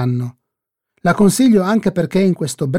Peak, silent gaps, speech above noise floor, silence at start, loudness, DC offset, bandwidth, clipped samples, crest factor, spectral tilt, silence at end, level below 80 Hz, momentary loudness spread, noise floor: -2 dBFS; none; 66 dB; 0 s; -15 LUFS; under 0.1%; 16 kHz; under 0.1%; 14 dB; -6 dB/octave; 0 s; -50 dBFS; 9 LU; -80 dBFS